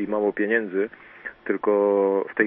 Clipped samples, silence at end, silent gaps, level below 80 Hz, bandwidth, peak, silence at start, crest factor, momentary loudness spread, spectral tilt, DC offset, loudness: under 0.1%; 0 s; none; -68 dBFS; 3.8 kHz; -6 dBFS; 0 s; 18 dB; 15 LU; -10.5 dB/octave; under 0.1%; -23 LUFS